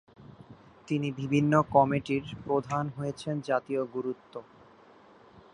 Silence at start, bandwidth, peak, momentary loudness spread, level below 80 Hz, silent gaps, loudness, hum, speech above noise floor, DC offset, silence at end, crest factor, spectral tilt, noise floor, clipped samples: 0.2 s; 10.5 kHz; -8 dBFS; 12 LU; -62 dBFS; none; -29 LUFS; none; 27 dB; under 0.1%; 0.15 s; 22 dB; -7.5 dB/octave; -56 dBFS; under 0.1%